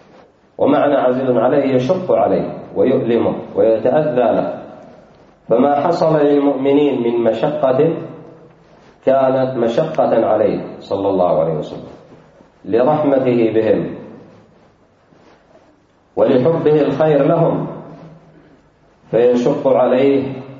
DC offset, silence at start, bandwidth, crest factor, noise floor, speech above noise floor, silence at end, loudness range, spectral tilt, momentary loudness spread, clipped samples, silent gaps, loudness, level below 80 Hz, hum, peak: under 0.1%; 0.6 s; 7.4 kHz; 14 dB; -53 dBFS; 38 dB; 0 s; 3 LU; -8.5 dB/octave; 10 LU; under 0.1%; none; -15 LUFS; -56 dBFS; none; -2 dBFS